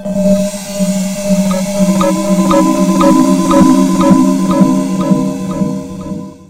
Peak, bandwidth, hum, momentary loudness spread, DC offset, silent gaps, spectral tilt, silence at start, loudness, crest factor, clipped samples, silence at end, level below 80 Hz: 0 dBFS; 16.5 kHz; none; 9 LU; under 0.1%; none; -6.5 dB/octave; 0 s; -11 LUFS; 10 dB; 0.4%; 0.05 s; -38 dBFS